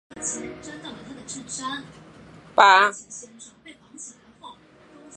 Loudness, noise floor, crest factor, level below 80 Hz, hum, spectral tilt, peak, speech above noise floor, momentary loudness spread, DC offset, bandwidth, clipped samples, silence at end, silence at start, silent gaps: -20 LUFS; -51 dBFS; 24 dB; -64 dBFS; none; -1 dB/octave; 0 dBFS; 28 dB; 26 LU; under 0.1%; 11 kHz; under 0.1%; 0.65 s; 0.15 s; none